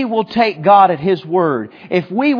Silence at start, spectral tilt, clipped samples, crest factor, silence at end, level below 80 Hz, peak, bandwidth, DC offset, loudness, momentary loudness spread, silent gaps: 0 s; -8.5 dB/octave; under 0.1%; 14 dB; 0 s; -58 dBFS; 0 dBFS; 5.4 kHz; under 0.1%; -14 LUFS; 10 LU; none